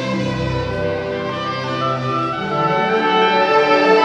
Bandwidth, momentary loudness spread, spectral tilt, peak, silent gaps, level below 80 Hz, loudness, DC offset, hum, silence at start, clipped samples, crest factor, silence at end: 9.2 kHz; 9 LU; -6 dB/octave; -2 dBFS; none; -42 dBFS; -17 LUFS; under 0.1%; none; 0 s; under 0.1%; 14 dB; 0 s